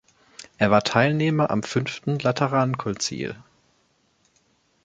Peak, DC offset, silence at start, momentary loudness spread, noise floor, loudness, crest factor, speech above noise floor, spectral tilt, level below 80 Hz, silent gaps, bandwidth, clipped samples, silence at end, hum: -2 dBFS; under 0.1%; 0.4 s; 14 LU; -66 dBFS; -23 LUFS; 22 dB; 43 dB; -5.5 dB/octave; -58 dBFS; none; 9.2 kHz; under 0.1%; 1.45 s; none